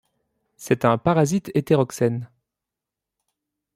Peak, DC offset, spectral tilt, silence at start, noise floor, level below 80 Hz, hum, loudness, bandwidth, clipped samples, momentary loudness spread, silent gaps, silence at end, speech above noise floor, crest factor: -4 dBFS; under 0.1%; -6.5 dB/octave; 0.6 s; -86 dBFS; -58 dBFS; none; -21 LUFS; 16 kHz; under 0.1%; 7 LU; none; 1.5 s; 66 dB; 20 dB